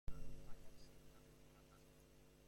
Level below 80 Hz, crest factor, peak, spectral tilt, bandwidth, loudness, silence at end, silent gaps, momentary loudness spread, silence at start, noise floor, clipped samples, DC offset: -58 dBFS; 16 dB; -34 dBFS; -5.5 dB/octave; 16.5 kHz; -64 LUFS; 0 s; none; 9 LU; 0.05 s; -67 dBFS; under 0.1%; under 0.1%